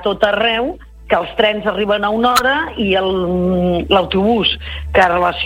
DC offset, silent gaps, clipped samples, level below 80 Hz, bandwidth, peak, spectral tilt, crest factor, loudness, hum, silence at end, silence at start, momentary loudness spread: under 0.1%; none; under 0.1%; -34 dBFS; 16.5 kHz; 0 dBFS; -5 dB/octave; 16 dB; -15 LUFS; none; 0 s; 0 s; 5 LU